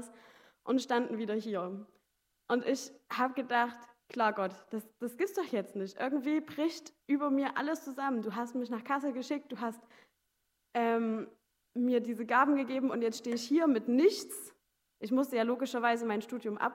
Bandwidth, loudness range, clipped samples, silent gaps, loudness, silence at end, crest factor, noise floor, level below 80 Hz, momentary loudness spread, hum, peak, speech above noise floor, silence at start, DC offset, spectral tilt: 16 kHz; 5 LU; under 0.1%; none; -33 LUFS; 0 s; 20 dB; -80 dBFS; -90 dBFS; 14 LU; none; -14 dBFS; 48 dB; 0 s; under 0.1%; -4.5 dB/octave